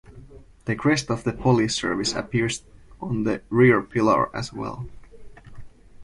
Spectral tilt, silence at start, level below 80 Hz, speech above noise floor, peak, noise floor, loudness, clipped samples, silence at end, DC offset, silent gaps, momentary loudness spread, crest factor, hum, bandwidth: -5.5 dB/octave; 0.1 s; -48 dBFS; 23 dB; -6 dBFS; -46 dBFS; -23 LUFS; under 0.1%; 0 s; under 0.1%; none; 15 LU; 18 dB; none; 11.5 kHz